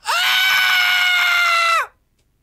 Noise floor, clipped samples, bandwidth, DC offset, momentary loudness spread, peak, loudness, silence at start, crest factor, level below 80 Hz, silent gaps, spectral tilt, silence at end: -62 dBFS; under 0.1%; 16 kHz; under 0.1%; 4 LU; -2 dBFS; -14 LUFS; 0.05 s; 14 dB; -64 dBFS; none; 3 dB/octave; 0.55 s